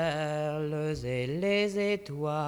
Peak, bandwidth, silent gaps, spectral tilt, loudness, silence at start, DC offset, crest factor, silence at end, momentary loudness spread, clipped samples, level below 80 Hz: -16 dBFS; 15.5 kHz; none; -6 dB/octave; -31 LUFS; 0 s; under 0.1%; 14 dB; 0 s; 5 LU; under 0.1%; -56 dBFS